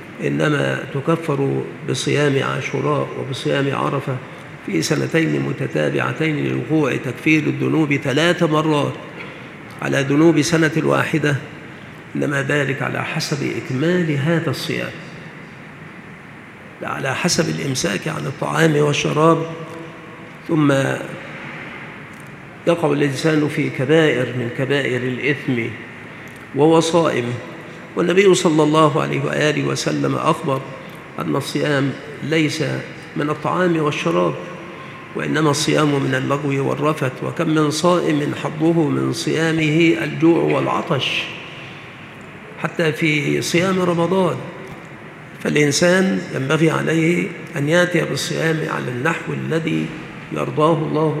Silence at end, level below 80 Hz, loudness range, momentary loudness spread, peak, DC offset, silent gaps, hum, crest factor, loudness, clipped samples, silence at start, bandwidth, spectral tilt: 0 s; -58 dBFS; 4 LU; 19 LU; 0 dBFS; under 0.1%; none; none; 18 dB; -19 LUFS; under 0.1%; 0 s; 14.5 kHz; -5.5 dB/octave